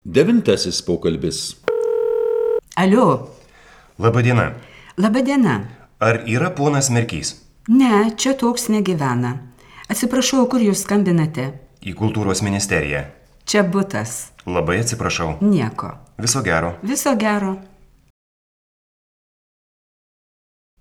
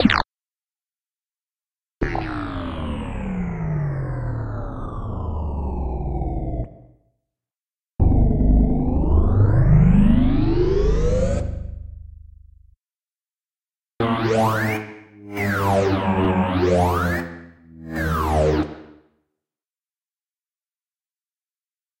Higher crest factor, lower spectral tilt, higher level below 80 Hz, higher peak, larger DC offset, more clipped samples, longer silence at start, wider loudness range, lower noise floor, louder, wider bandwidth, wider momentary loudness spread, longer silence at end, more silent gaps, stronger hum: about the same, 18 dB vs 20 dB; second, -5 dB/octave vs -7.5 dB/octave; second, -46 dBFS vs -26 dBFS; about the same, 0 dBFS vs -2 dBFS; neither; neither; about the same, 0.05 s vs 0 s; second, 4 LU vs 11 LU; second, -47 dBFS vs under -90 dBFS; first, -18 LUFS vs -21 LUFS; about the same, 17.5 kHz vs 16 kHz; about the same, 12 LU vs 14 LU; about the same, 3.15 s vs 3.15 s; second, none vs 1.44-1.48 s; neither